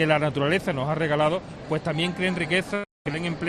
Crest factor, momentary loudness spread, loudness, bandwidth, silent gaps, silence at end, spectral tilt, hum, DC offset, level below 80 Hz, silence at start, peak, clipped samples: 16 dB; 8 LU; -25 LUFS; 13.5 kHz; 2.91-3.05 s; 0 s; -6 dB/octave; none; under 0.1%; -54 dBFS; 0 s; -8 dBFS; under 0.1%